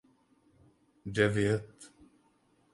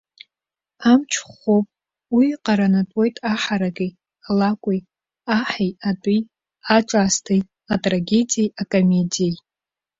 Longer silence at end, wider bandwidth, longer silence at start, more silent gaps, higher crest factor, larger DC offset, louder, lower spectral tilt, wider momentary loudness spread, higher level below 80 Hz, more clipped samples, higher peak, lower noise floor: first, 0.85 s vs 0.65 s; first, 11.5 kHz vs 7.8 kHz; first, 1.05 s vs 0.8 s; neither; first, 24 dB vs 18 dB; neither; second, -30 LUFS vs -20 LUFS; about the same, -6 dB/octave vs -5 dB/octave; first, 26 LU vs 8 LU; about the same, -60 dBFS vs -56 dBFS; neither; second, -12 dBFS vs -2 dBFS; second, -69 dBFS vs -89 dBFS